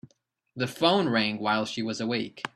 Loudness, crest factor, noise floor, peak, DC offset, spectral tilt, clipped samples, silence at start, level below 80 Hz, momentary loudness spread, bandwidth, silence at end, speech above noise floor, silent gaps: -27 LUFS; 22 dB; -70 dBFS; -6 dBFS; under 0.1%; -5 dB/octave; under 0.1%; 0.55 s; -68 dBFS; 10 LU; 13.5 kHz; 0.05 s; 43 dB; none